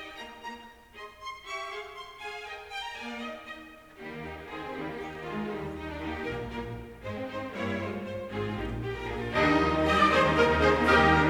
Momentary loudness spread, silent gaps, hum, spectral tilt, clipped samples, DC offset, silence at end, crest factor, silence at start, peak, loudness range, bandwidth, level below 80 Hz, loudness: 20 LU; none; none; -5.5 dB/octave; under 0.1%; under 0.1%; 0 s; 20 dB; 0 s; -10 dBFS; 13 LU; 19.5 kHz; -46 dBFS; -29 LUFS